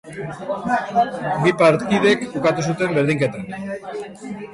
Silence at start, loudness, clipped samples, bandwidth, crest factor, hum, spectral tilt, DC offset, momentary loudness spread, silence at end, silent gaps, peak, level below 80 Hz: 0.05 s; -20 LUFS; under 0.1%; 11.5 kHz; 16 dB; none; -6 dB/octave; under 0.1%; 16 LU; 0 s; none; -4 dBFS; -56 dBFS